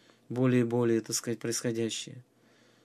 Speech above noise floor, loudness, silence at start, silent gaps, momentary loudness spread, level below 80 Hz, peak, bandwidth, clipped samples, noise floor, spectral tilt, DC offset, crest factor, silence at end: 34 dB; -30 LUFS; 0.3 s; none; 11 LU; -76 dBFS; -14 dBFS; 14.5 kHz; under 0.1%; -63 dBFS; -5 dB/octave; under 0.1%; 16 dB; 0.65 s